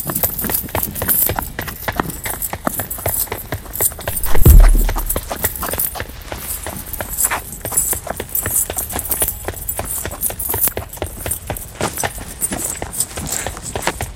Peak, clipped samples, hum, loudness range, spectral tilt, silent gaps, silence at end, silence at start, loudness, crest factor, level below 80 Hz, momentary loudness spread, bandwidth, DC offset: 0 dBFS; under 0.1%; none; 4 LU; -3.5 dB/octave; none; 0 s; 0 s; -19 LUFS; 18 dB; -20 dBFS; 10 LU; 17.5 kHz; under 0.1%